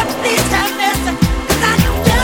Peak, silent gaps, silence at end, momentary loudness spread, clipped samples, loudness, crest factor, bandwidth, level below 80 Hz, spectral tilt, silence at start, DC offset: 0 dBFS; none; 0 s; 3 LU; under 0.1%; -14 LUFS; 14 dB; over 20 kHz; -22 dBFS; -4 dB/octave; 0 s; under 0.1%